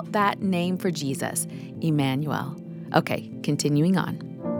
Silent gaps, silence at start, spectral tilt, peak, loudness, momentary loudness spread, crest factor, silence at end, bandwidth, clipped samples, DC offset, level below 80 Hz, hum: none; 0 s; -5.5 dB/octave; -4 dBFS; -26 LUFS; 9 LU; 22 dB; 0 s; 19 kHz; under 0.1%; under 0.1%; -68 dBFS; none